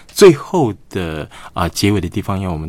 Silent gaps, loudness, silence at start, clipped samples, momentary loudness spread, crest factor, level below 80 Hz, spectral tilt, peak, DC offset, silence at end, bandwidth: none; -16 LUFS; 0.15 s; 0.3%; 15 LU; 16 dB; -38 dBFS; -5.5 dB/octave; 0 dBFS; under 0.1%; 0 s; 16.5 kHz